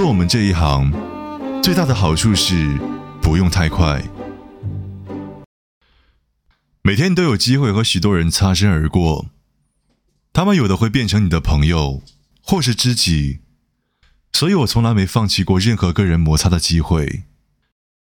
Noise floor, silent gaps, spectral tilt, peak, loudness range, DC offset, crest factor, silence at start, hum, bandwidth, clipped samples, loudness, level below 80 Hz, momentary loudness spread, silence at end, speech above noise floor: -64 dBFS; 5.46-5.81 s; -5 dB/octave; -2 dBFS; 5 LU; under 0.1%; 14 dB; 0 s; none; 18.5 kHz; under 0.1%; -16 LUFS; -30 dBFS; 15 LU; 0.8 s; 50 dB